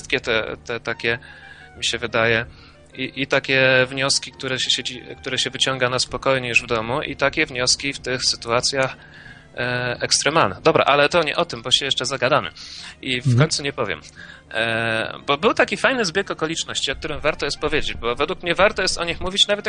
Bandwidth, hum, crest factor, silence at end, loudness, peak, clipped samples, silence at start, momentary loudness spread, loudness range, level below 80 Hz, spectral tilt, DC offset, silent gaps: 10 kHz; none; 22 dB; 0 s; -20 LUFS; 0 dBFS; under 0.1%; 0 s; 11 LU; 3 LU; -44 dBFS; -3 dB/octave; under 0.1%; none